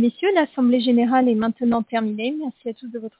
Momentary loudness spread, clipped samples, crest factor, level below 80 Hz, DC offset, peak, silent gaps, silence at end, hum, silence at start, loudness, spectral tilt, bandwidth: 13 LU; under 0.1%; 14 dB; -64 dBFS; under 0.1%; -6 dBFS; none; 0.1 s; none; 0 s; -20 LUFS; -10 dB/octave; 4 kHz